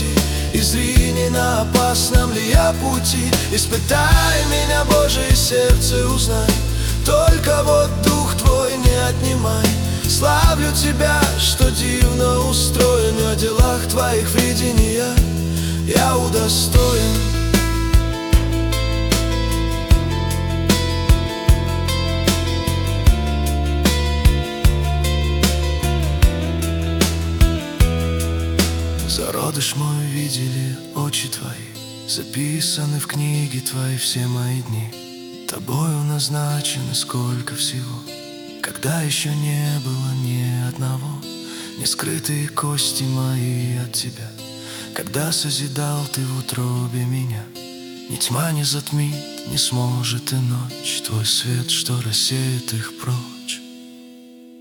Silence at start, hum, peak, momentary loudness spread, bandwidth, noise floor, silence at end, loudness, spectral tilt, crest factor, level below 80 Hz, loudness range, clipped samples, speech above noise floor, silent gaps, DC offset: 0 s; none; 0 dBFS; 10 LU; 18 kHz; -42 dBFS; 0 s; -18 LUFS; -4.5 dB/octave; 18 dB; -24 dBFS; 7 LU; under 0.1%; 24 dB; none; under 0.1%